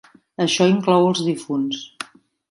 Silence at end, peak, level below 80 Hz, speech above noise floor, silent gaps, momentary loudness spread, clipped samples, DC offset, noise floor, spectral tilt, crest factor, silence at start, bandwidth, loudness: 0.45 s; -4 dBFS; -66 dBFS; 20 dB; none; 19 LU; under 0.1%; under 0.1%; -38 dBFS; -5 dB/octave; 16 dB; 0.4 s; 11.5 kHz; -19 LUFS